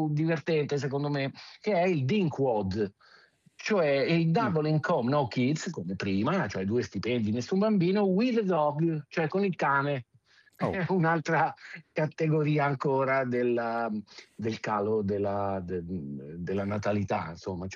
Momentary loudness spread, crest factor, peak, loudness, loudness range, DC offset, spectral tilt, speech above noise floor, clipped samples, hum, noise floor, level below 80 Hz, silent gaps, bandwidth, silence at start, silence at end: 10 LU; 14 dB; -14 dBFS; -29 LUFS; 4 LU; under 0.1%; -7 dB/octave; 34 dB; under 0.1%; none; -63 dBFS; -70 dBFS; none; 7.6 kHz; 0 s; 0 s